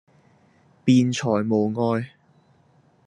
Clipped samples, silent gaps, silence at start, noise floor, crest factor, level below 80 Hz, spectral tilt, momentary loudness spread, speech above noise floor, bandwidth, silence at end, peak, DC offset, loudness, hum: under 0.1%; none; 0.85 s; -59 dBFS; 18 dB; -68 dBFS; -6.5 dB/octave; 9 LU; 39 dB; 10.5 kHz; 1 s; -6 dBFS; under 0.1%; -22 LUFS; none